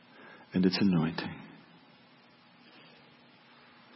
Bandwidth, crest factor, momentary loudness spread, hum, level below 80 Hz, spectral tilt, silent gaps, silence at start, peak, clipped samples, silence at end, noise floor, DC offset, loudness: 6 kHz; 22 dB; 26 LU; none; -68 dBFS; -9 dB/octave; none; 0.2 s; -14 dBFS; under 0.1%; 2.45 s; -60 dBFS; under 0.1%; -30 LUFS